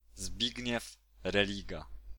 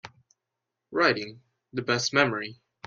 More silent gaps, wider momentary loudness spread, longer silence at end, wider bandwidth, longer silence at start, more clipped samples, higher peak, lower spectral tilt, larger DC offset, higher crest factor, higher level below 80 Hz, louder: neither; about the same, 14 LU vs 15 LU; second, 0 s vs 0.3 s; first, 19.5 kHz vs 9 kHz; about the same, 0.05 s vs 0.05 s; neither; second, -12 dBFS vs -4 dBFS; about the same, -3.5 dB/octave vs -3.5 dB/octave; neither; about the same, 24 dB vs 24 dB; first, -50 dBFS vs -68 dBFS; second, -35 LUFS vs -26 LUFS